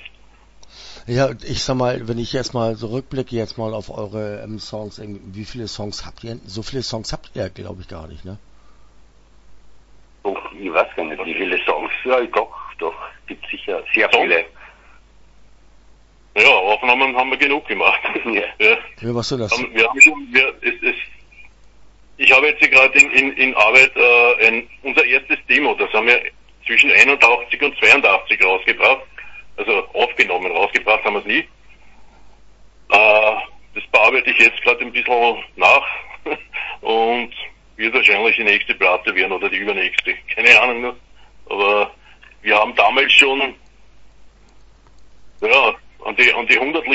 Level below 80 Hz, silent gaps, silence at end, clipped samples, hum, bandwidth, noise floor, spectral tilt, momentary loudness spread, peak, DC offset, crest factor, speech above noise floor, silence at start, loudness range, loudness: -48 dBFS; none; 0 s; under 0.1%; none; 11 kHz; -48 dBFS; -3 dB/octave; 19 LU; 0 dBFS; under 0.1%; 18 dB; 31 dB; 0.6 s; 16 LU; -14 LUFS